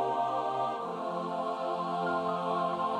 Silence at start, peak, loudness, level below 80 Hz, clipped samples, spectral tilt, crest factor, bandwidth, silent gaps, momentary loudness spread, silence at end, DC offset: 0 s; -18 dBFS; -32 LUFS; -74 dBFS; under 0.1%; -6.5 dB/octave; 14 dB; 11 kHz; none; 4 LU; 0 s; under 0.1%